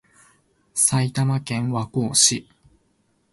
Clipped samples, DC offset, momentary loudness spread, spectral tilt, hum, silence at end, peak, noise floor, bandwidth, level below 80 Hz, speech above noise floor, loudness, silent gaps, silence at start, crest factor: under 0.1%; under 0.1%; 10 LU; -3 dB/octave; none; 0.9 s; -2 dBFS; -66 dBFS; 12 kHz; -58 dBFS; 45 dB; -20 LUFS; none; 0.75 s; 22 dB